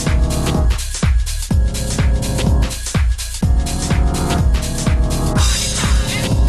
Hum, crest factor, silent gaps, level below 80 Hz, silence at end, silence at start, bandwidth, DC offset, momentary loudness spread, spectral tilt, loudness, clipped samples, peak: none; 12 dB; none; -18 dBFS; 0 s; 0 s; 14 kHz; under 0.1%; 3 LU; -4.5 dB/octave; -17 LUFS; under 0.1%; -2 dBFS